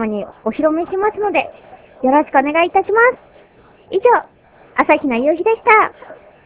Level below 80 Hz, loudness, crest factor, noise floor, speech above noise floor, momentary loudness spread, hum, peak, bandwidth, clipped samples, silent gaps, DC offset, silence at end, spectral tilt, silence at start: -54 dBFS; -15 LUFS; 16 dB; -47 dBFS; 32 dB; 11 LU; none; 0 dBFS; 4 kHz; under 0.1%; none; under 0.1%; 0.3 s; -8.5 dB/octave; 0 s